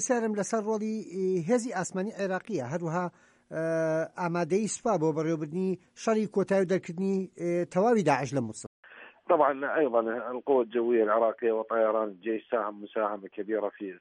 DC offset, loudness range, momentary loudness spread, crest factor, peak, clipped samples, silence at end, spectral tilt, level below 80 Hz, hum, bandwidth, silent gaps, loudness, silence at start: under 0.1%; 4 LU; 8 LU; 18 dB; -10 dBFS; under 0.1%; 0.05 s; -6 dB/octave; -76 dBFS; none; 11 kHz; 8.67-8.83 s; -29 LUFS; 0 s